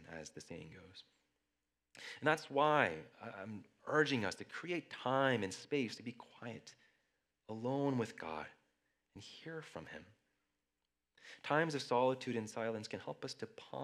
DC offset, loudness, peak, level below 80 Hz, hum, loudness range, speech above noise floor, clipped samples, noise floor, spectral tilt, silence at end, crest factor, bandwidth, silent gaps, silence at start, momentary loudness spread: under 0.1%; -38 LUFS; -16 dBFS; -84 dBFS; none; 7 LU; 50 dB; under 0.1%; -90 dBFS; -5 dB/octave; 0 s; 26 dB; 13.5 kHz; none; 0 s; 19 LU